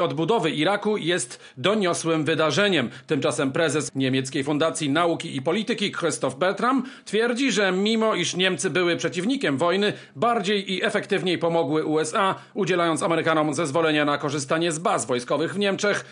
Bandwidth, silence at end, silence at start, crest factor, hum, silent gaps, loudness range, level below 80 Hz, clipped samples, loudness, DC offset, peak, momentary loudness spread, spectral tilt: 11 kHz; 0 s; 0 s; 18 dB; none; none; 1 LU; -74 dBFS; under 0.1%; -23 LUFS; under 0.1%; -6 dBFS; 4 LU; -4 dB/octave